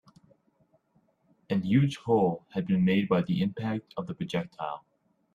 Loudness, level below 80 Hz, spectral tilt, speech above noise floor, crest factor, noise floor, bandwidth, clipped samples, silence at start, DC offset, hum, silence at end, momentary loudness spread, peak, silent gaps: -28 LUFS; -64 dBFS; -8 dB/octave; 42 dB; 18 dB; -69 dBFS; 10 kHz; under 0.1%; 1.5 s; under 0.1%; none; 0.55 s; 12 LU; -12 dBFS; none